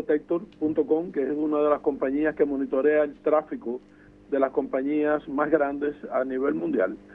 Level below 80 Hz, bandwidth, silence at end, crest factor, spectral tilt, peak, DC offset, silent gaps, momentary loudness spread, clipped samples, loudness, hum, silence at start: -60 dBFS; 3.9 kHz; 0 s; 18 dB; -9 dB/octave; -8 dBFS; under 0.1%; none; 7 LU; under 0.1%; -26 LUFS; 50 Hz at -55 dBFS; 0 s